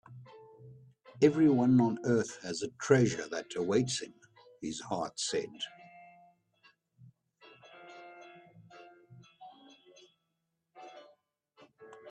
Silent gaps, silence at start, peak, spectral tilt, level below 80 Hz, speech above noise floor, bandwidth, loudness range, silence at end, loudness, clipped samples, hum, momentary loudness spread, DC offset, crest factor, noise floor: none; 0.1 s; -12 dBFS; -5.5 dB/octave; -72 dBFS; 53 dB; 10.5 kHz; 26 LU; 0 s; -31 LUFS; under 0.1%; none; 28 LU; under 0.1%; 24 dB; -83 dBFS